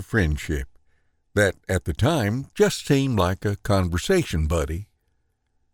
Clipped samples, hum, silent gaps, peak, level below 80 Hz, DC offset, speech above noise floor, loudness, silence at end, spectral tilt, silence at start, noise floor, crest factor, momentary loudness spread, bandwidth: under 0.1%; none; none; -6 dBFS; -36 dBFS; under 0.1%; 47 dB; -23 LUFS; 0.9 s; -5.5 dB/octave; 0 s; -69 dBFS; 18 dB; 8 LU; 19 kHz